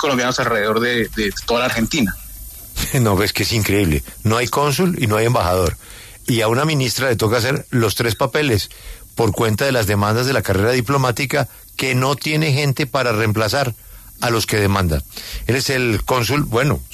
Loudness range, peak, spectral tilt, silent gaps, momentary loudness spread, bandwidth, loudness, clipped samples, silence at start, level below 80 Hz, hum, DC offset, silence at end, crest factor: 1 LU; -4 dBFS; -5 dB/octave; none; 7 LU; 14 kHz; -18 LUFS; under 0.1%; 0 s; -36 dBFS; none; under 0.1%; 0 s; 14 dB